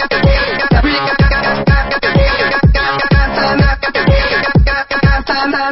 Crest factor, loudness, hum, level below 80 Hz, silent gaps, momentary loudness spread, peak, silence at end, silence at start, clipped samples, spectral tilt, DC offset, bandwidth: 12 dB; -12 LUFS; none; -16 dBFS; none; 2 LU; 0 dBFS; 0 s; 0 s; under 0.1%; -9.5 dB/octave; under 0.1%; 5.8 kHz